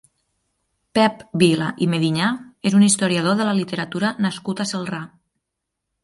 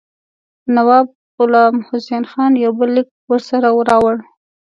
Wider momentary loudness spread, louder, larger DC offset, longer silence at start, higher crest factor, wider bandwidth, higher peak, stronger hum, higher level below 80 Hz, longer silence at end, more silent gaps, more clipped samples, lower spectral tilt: about the same, 10 LU vs 10 LU; second, -20 LUFS vs -14 LUFS; neither; first, 0.95 s vs 0.65 s; about the same, 18 dB vs 14 dB; about the same, 11.5 kHz vs 10.5 kHz; about the same, -2 dBFS vs 0 dBFS; neither; about the same, -62 dBFS vs -58 dBFS; first, 0.95 s vs 0.55 s; second, none vs 1.15-1.38 s, 3.11-3.28 s; neither; second, -5 dB/octave vs -6.5 dB/octave